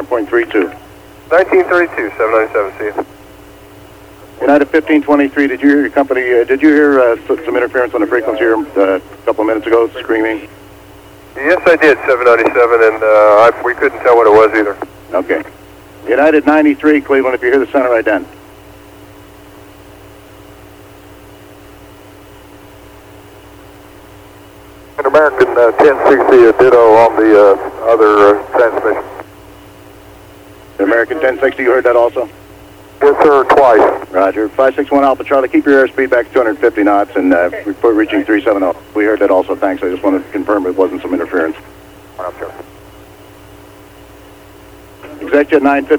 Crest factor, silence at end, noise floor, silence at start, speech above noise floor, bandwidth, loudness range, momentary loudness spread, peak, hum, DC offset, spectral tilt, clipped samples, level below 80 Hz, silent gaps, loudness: 12 dB; 0 s; -37 dBFS; 0 s; 27 dB; 19 kHz; 9 LU; 11 LU; 0 dBFS; none; under 0.1%; -6 dB/octave; under 0.1%; -46 dBFS; none; -11 LUFS